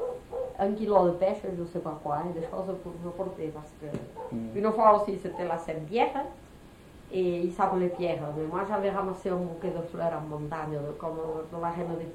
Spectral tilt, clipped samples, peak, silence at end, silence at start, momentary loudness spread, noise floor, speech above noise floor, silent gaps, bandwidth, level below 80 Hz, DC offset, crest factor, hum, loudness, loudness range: -7.5 dB/octave; under 0.1%; -8 dBFS; 0 s; 0 s; 13 LU; -51 dBFS; 21 dB; none; 15 kHz; -56 dBFS; under 0.1%; 22 dB; none; -30 LUFS; 5 LU